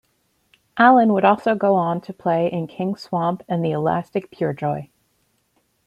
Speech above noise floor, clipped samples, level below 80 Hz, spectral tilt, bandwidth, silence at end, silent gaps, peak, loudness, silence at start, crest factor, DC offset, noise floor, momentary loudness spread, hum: 47 dB; under 0.1%; -64 dBFS; -8.5 dB/octave; 10.5 kHz; 1.05 s; none; -2 dBFS; -20 LUFS; 0.75 s; 18 dB; under 0.1%; -67 dBFS; 12 LU; none